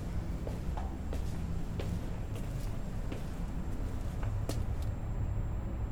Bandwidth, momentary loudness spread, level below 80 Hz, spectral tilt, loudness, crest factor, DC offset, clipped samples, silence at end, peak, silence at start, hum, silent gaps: over 20 kHz; 4 LU; -38 dBFS; -7 dB/octave; -39 LUFS; 14 dB; under 0.1%; under 0.1%; 0 s; -20 dBFS; 0 s; none; none